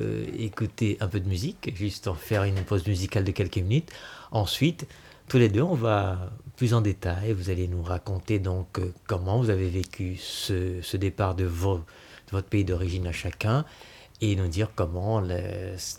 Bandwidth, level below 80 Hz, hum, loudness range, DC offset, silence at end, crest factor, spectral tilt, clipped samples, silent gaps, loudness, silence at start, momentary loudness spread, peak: 16 kHz; -46 dBFS; none; 3 LU; under 0.1%; 0 s; 18 dB; -6.5 dB/octave; under 0.1%; none; -28 LUFS; 0 s; 9 LU; -8 dBFS